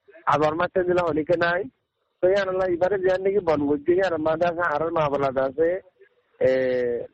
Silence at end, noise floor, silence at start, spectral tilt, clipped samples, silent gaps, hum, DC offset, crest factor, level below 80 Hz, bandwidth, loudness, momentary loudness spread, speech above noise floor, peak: 0.05 s; -59 dBFS; 0.15 s; -7 dB/octave; under 0.1%; none; none; under 0.1%; 16 dB; -54 dBFS; 8.2 kHz; -23 LUFS; 3 LU; 37 dB; -8 dBFS